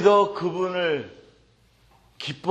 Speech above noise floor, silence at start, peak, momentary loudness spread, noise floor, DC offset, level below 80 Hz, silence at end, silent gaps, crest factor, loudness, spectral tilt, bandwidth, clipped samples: 37 dB; 0 s; -4 dBFS; 15 LU; -59 dBFS; under 0.1%; -64 dBFS; 0 s; none; 20 dB; -25 LUFS; -5.5 dB/octave; 8.6 kHz; under 0.1%